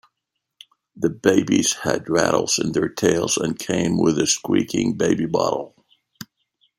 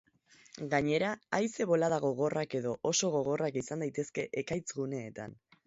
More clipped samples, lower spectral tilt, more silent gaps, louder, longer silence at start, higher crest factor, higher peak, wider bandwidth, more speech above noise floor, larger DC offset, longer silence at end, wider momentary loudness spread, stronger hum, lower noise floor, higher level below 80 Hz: neither; about the same, -4 dB/octave vs -4.5 dB/octave; neither; first, -20 LUFS vs -33 LUFS; first, 0.95 s vs 0.55 s; about the same, 20 dB vs 20 dB; first, -2 dBFS vs -14 dBFS; first, 16.5 kHz vs 8 kHz; first, 60 dB vs 31 dB; neither; first, 0.55 s vs 0.35 s; about the same, 10 LU vs 11 LU; neither; first, -80 dBFS vs -63 dBFS; first, -56 dBFS vs -68 dBFS